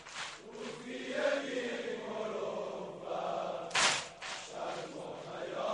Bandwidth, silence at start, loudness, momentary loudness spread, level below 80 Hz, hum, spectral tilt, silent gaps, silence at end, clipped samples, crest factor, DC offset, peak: 10.5 kHz; 0 s; -37 LUFS; 14 LU; -74 dBFS; none; -2 dB/octave; none; 0 s; under 0.1%; 22 dB; under 0.1%; -16 dBFS